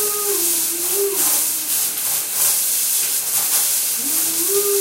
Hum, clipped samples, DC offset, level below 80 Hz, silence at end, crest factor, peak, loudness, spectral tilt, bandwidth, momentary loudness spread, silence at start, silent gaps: none; under 0.1%; under 0.1%; -70 dBFS; 0 s; 16 dB; -4 dBFS; -16 LUFS; 0.5 dB/octave; 17 kHz; 3 LU; 0 s; none